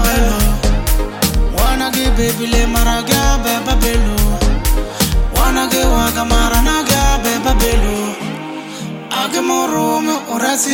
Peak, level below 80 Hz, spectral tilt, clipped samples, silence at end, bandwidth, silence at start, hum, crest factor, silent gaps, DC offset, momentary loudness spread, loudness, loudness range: 0 dBFS; -16 dBFS; -4 dB/octave; under 0.1%; 0 s; 17 kHz; 0 s; none; 14 dB; none; under 0.1%; 6 LU; -15 LUFS; 2 LU